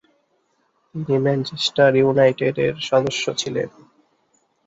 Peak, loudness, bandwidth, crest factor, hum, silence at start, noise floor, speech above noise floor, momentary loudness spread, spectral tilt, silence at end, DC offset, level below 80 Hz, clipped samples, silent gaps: -2 dBFS; -19 LUFS; 8 kHz; 18 dB; none; 0.95 s; -66 dBFS; 47 dB; 12 LU; -5 dB/octave; 1 s; under 0.1%; -60 dBFS; under 0.1%; none